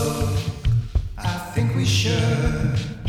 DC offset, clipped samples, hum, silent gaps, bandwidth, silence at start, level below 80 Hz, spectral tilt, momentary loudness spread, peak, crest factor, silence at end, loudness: under 0.1%; under 0.1%; none; none; 15.5 kHz; 0 s; -30 dBFS; -5.5 dB/octave; 7 LU; -8 dBFS; 14 dB; 0 s; -22 LUFS